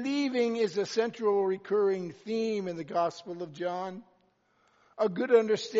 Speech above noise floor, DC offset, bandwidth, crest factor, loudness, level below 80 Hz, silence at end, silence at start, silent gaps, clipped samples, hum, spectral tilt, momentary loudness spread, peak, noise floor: 40 dB; under 0.1%; 7.6 kHz; 20 dB; -30 LUFS; -82 dBFS; 0 s; 0 s; none; under 0.1%; none; -4 dB/octave; 11 LU; -10 dBFS; -69 dBFS